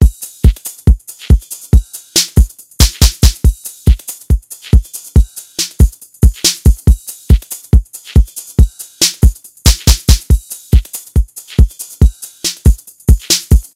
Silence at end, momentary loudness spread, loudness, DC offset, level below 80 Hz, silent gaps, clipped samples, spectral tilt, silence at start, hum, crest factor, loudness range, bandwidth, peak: 0.15 s; 7 LU; -13 LUFS; under 0.1%; -12 dBFS; none; 2%; -4.5 dB/octave; 0 s; none; 12 dB; 1 LU; 16.5 kHz; 0 dBFS